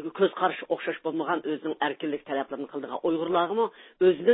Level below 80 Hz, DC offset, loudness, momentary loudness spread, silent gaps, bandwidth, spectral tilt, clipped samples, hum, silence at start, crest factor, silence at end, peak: -72 dBFS; under 0.1%; -28 LUFS; 7 LU; none; 4 kHz; -9.5 dB/octave; under 0.1%; none; 0 s; 18 dB; 0 s; -10 dBFS